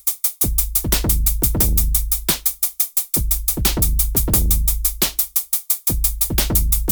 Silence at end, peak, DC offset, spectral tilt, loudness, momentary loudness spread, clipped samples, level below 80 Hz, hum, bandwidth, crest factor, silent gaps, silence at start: 0 s; -2 dBFS; under 0.1%; -3 dB/octave; -17 LUFS; 3 LU; under 0.1%; -22 dBFS; none; over 20 kHz; 18 dB; none; 0.05 s